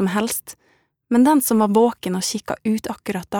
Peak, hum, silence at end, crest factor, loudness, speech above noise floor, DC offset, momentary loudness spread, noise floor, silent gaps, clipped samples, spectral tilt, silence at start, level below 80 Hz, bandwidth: -4 dBFS; none; 0 s; 16 dB; -19 LUFS; 40 dB; under 0.1%; 12 LU; -59 dBFS; none; under 0.1%; -4.5 dB/octave; 0 s; -58 dBFS; over 20 kHz